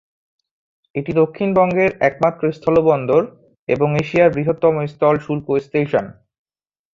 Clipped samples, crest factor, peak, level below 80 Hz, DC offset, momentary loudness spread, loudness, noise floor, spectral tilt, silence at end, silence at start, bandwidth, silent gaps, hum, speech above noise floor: under 0.1%; 16 dB; -2 dBFS; -52 dBFS; under 0.1%; 8 LU; -17 LUFS; under -90 dBFS; -8.5 dB/octave; 0.8 s; 0.95 s; 7.4 kHz; 3.59-3.67 s; none; over 73 dB